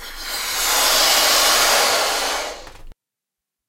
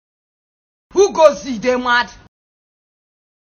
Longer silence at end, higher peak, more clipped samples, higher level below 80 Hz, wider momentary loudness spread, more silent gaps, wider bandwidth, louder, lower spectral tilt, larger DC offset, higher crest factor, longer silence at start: second, 0.75 s vs 1.45 s; about the same, -2 dBFS vs 0 dBFS; second, under 0.1% vs 0.1%; first, -42 dBFS vs -52 dBFS; about the same, 12 LU vs 10 LU; neither; first, 16 kHz vs 8 kHz; about the same, -15 LUFS vs -15 LUFS; second, 1.5 dB/octave vs -3 dB/octave; neither; about the same, 18 dB vs 18 dB; second, 0 s vs 0.95 s